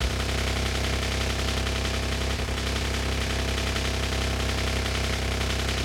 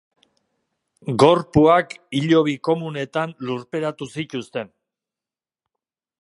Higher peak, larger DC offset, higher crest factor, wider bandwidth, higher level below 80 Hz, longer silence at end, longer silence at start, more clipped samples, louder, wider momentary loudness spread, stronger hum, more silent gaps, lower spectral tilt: second, -14 dBFS vs 0 dBFS; neither; second, 12 dB vs 22 dB; first, 16.5 kHz vs 11.5 kHz; first, -30 dBFS vs -52 dBFS; second, 0 s vs 1.55 s; second, 0 s vs 1.05 s; neither; second, -27 LUFS vs -20 LUFS; second, 1 LU vs 15 LU; neither; neither; second, -4 dB/octave vs -6.5 dB/octave